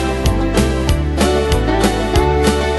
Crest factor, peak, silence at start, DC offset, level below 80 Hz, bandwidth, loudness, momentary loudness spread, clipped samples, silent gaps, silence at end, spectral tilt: 14 dB; 0 dBFS; 0 s; under 0.1%; -20 dBFS; 12.5 kHz; -15 LUFS; 3 LU; under 0.1%; none; 0 s; -5.5 dB/octave